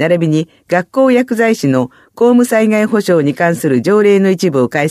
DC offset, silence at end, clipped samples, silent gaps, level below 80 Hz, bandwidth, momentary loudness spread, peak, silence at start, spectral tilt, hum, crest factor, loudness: under 0.1%; 0 s; under 0.1%; none; -60 dBFS; 15 kHz; 6 LU; 0 dBFS; 0 s; -6.5 dB/octave; none; 12 dB; -12 LUFS